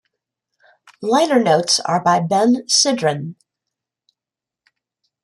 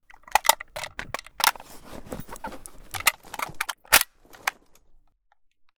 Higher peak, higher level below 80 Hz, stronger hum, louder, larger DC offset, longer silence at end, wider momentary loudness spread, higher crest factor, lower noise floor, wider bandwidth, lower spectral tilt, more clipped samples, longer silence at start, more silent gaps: about the same, -2 dBFS vs 0 dBFS; second, -68 dBFS vs -52 dBFS; neither; first, -16 LUFS vs -24 LUFS; neither; first, 1.9 s vs 1.3 s; second, 10 LU vs 20 LU; second, 16 dB vs 28 dB; first, -88 dBFS vs -65 dBFS; second, 12.5 kHz vs over 20 kHz; first, -3.5 dB/octave vs 0 dB/octave; neither; first, 1 s vs 0.3 s; neither